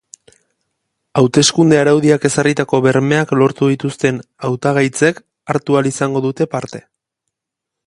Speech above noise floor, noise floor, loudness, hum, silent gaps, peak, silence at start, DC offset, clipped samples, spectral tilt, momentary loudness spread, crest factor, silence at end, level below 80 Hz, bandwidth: 67 dB; -81 dBFS; -14 LUFS; none; none; 0 dBFS; 1.15 s; under 0.1%; under 0.1%; -5 dB/octave; 10 LU; 16 dB; 1.05 s; -54 dBFS; 11.5 kHz